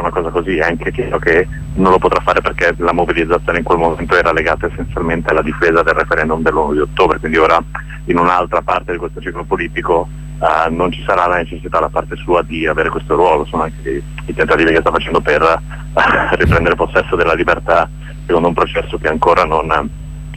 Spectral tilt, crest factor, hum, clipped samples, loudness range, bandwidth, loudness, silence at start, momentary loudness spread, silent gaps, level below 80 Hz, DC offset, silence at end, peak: -6.5 dB/octave; 14 dB; none; under 0.1%; 3 LU; 12 kHz; -14 LUFS; 0 s; 8 LU; none; -28 dBFS; under 0.1%; 0 s; 0 dBFS